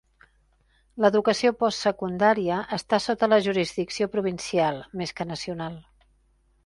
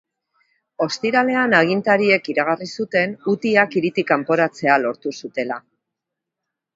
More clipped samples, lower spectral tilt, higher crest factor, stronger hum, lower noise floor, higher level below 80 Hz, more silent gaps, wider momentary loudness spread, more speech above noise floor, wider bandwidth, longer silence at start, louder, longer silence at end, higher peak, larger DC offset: neither; about the same, -5 dB/octave vs -5.5 dB/octave; about the same, 20 dB vs 20 dB; neither; second, -64 dBFS vs -83 dBFS; first, -60 dBFS vs -68 dBFS; neither; about the same, 11 LU vs 10 LU; second, 40 dB vs 64 dB; first, 11.5 kHz vs 7.8 kHz; first, 0.95 s vs 0.8 s; second, -25 LUFS vs -19 LUFS; second, 0.85 s vs 1.15 s; second, -6 dBFS vs 0 dBFS; neither